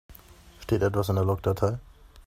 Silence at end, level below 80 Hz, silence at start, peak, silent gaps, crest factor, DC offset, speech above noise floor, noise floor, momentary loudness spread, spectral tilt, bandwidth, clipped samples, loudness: 0.05 s; -48 dBFS; 0.1 s; -10 dBFS; none; 18 dB; under 0.1%; 26 dB; -51 dBFS; 10 LU; -7.5 dB/octave; 16 kHz; under 0.1%; -27 LUFS